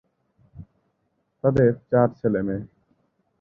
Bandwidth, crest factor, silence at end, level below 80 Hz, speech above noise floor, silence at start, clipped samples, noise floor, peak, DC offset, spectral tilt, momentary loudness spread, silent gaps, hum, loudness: 6 kHz; 20 dB; 0.75 s; -52 dBFS; 51 dB; 0.55 s; under 0.1%; -72 dBFS; -4 dBFS; under 0.1%; -11 dB/octave; 9 LU; none; none; -22 LUFS